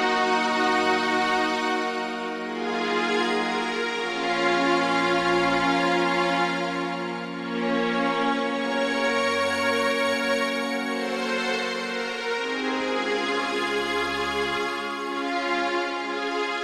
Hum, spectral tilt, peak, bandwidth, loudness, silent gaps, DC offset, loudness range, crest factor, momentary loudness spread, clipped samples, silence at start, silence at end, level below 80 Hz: none; -3.5 dB/octave; -10 dBFS; 14 kHz; -24 LUFS; none; under 0.1%; 3 LU; 14 dB; 6 LU; under 0.1%; 0 s; 0 s; -60 dBFS